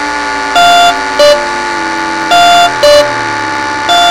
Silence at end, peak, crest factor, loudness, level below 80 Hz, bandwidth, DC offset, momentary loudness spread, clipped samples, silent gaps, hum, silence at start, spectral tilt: 0 s; 0 dBFS; 8 dB; -8 LUFS; -38 dBFS; 17.5 kHz; under 0.1%; 8 LU; 3%; none; none; 0 s; -2 dB/octave